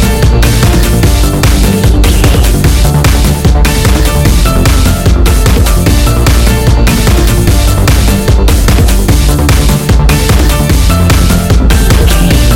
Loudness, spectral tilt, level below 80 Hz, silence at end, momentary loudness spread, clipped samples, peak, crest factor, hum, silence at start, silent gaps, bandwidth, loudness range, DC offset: -8 LUFS; -5 dB/octave; -8 dBFS; 0 s; 1 LU; 0.4%; 0 dBFS; 6 dB; none; 0 s; none; 17 kHz; 0 LU; under 0.1%